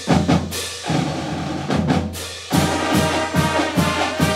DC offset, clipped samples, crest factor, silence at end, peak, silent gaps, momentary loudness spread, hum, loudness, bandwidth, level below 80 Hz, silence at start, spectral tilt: under 0.1%; under 0.1%; 18 dB; 0 s; -2 dBFS; none; 7 LU; none; -20 LUFS; 16 kHz; -40 dBFS; 0 s; -5 dB/octave